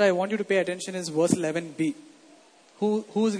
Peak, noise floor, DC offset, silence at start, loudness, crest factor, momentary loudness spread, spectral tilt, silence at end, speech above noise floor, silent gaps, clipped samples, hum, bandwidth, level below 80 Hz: -6 dBFS; -55 dBFS; under 0.1%; 0 s; -27 LUFS; 20 dB; 6 LU; -5 dB/octave; 0 s; 30 dB; none; under 0.1%; none; 11 kHz; -70 dBFS